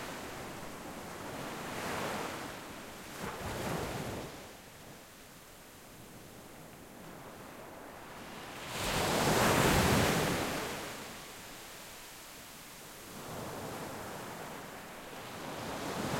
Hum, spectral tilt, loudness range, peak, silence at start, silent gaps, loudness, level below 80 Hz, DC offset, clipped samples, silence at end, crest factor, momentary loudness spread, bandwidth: none; -4 dB/octave; 18 LU; -14 dBFS; 0 s; none; -36 LUFS; -54 dBFS; under 0.1%; under 0.1%; 0 s; 22 dB; 22 LU; 16.5 kHz